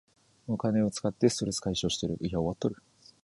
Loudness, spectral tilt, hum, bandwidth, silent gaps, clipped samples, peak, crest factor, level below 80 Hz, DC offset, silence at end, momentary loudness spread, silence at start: -30 LUFS; -5.5 dB/octave; none; 11.5 kHz; none; under 0.1%; -10 dBFS; 20 dB; -54 dBFS; under 0.1%; 0.5 s; 8 LU; 0.45 s